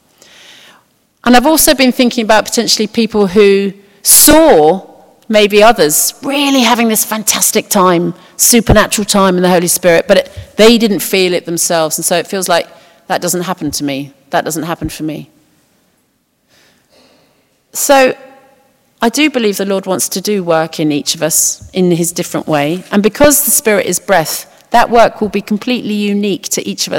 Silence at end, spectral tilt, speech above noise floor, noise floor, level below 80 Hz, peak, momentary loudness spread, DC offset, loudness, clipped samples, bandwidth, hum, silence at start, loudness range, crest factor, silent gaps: 0 s; -3 dB/octave; 48 dB; -59 dBFS; -36 dBFS; 0 dBFS; 11 LU; under 0.1%; -10 LUFS; 1%; over 20 kHz; none; 1.25 s; 10 LU; 12 dB; none